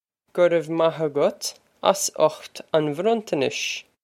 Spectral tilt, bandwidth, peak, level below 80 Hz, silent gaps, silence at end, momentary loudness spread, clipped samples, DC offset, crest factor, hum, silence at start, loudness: -3.5 dB/octave; 16.5 kHz; 0 dBFS; -74 dBFS; none; 0.25 s; 9 LU; under 0.1%; under 0.1%; 22 dB; none; 0.35 s; -23 LUFS